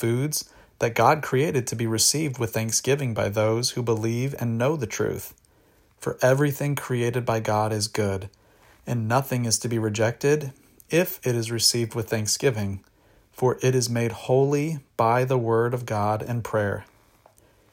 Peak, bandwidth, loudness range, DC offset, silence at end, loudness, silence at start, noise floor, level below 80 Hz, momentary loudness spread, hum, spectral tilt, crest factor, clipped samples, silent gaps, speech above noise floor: -6 dBFS; 16.5 kHz; 3 LU; under 0.1%; 0.9 s; -24 LUFS; 0 s; -60 dBFS; -60 dBFS; 9 LU; none; -4.5 dB/octave; 20 dB; under 0.1%; none; 36 dB